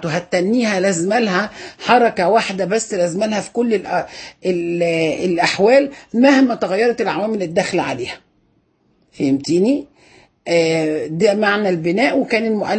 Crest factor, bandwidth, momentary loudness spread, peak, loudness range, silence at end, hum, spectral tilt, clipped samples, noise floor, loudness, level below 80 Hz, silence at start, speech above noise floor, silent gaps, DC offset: 16 dB; 8.8 kHz; 9 LU; 0 dBFS; 5 LU; 0 s; none; -5 dB/octave; under 0.1%; -60 dBFS; -17 LUFS; -58 dBFS; 0 s; 44 dB; none; under 0.1%